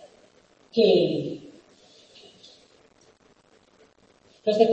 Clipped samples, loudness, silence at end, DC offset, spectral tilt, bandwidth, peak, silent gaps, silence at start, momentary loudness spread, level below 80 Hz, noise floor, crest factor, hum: under 0.1%; -23 LUFS; 0 s; under 0.1%; -6.5 dB/octave; 8.4 kHz; -6 dBFS; none; 0.75 s; 20 LU; -72 dBFS; -60 dBFS; 22 dB; none